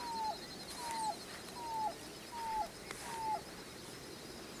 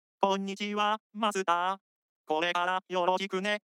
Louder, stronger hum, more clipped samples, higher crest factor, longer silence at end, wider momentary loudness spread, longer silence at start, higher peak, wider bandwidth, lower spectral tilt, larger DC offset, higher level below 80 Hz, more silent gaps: second, -43 LUFS vs -30 LUFS; neither; neither; about the same, 20 dB vs 20 dB; about the same, 0 s vs 0.1 s; first, 8 LU vs 5 LU; second, 0 s vs 0.2 s; second, -22 dBFS vs -10 dBFS; about the same, 16 kHz vs 15 kHz; second, -2.5 dB/octave vs -4 dB/octave; neither; first, -66 dBFS vs under -90 dBFS; second, none vs 1.00-1.10 s, 1.81-2.24 s